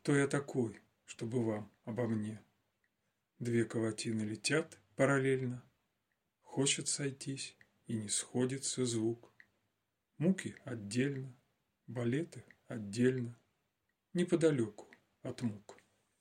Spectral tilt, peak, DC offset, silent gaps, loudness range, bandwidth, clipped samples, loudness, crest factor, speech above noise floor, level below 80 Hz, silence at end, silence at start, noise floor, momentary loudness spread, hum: -5 dB/octave; -16 dBFS; under 0.1%; none; 4 LU; 15 kHz; under 0.1%; -36 LUFS; 20 dB; 49 dB; -78 dBFS; 0.45 s; 0.05 s; -84 dBFS; 15 LU; none